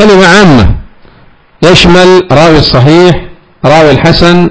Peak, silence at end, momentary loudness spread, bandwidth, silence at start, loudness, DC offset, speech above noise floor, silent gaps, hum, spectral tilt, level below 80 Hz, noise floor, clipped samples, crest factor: 0 dBFS; 0 s; 8 LU; 8 kHz; 0 s; -3 LUFS; 5%; 35 dB; none; none; -5.5 dB/octave; -20 dBFS; -38 dBFS; 30%; 4 dB